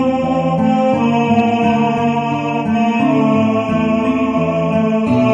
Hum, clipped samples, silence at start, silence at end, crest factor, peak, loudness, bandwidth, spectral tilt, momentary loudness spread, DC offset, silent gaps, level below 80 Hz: none; under 0.1%; 0 s; 0 s; 12 dB; -2 dBFS; -15 LUFS; 7.8 kHz; -7.5 dB/octave; 3 LU; under 0.1%; none; -46 dBFS